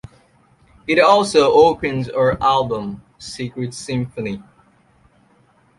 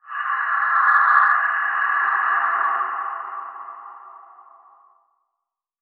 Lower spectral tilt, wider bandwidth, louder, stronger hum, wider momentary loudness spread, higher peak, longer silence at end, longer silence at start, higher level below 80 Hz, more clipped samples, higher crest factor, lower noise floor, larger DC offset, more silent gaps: first, -5 dB/octave vs 6 dB/octave; first, 11.5 kHz vs 4.9 kHz; about the same, -17 LUFS vs -19 LUFS; neither; about the same, 19 LU vs 21 LU; about the same, -2 dBFS vs -2 dBFS; second, 1.4 s vs 1.6 s; first, 0.9 s vs 0.05 s; first, -48 dBFS vs under -90 dBFS; neither; about the same, 18 dB vs 20 dB; second, -56 dBFS vs -82 dBFS; neither; neither